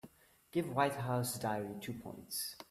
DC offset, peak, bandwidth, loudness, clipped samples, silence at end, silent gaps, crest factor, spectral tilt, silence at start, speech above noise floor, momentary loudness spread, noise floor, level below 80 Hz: under 0.1%; -18 dBFS; 16 kHz; -38 LUFS; under 0.1%; 0.05 s; none; 22 dB; -4.5 dB/octave; 0.05 s; 23 dB; 11 LU; -61 dBFS; -72 dBFS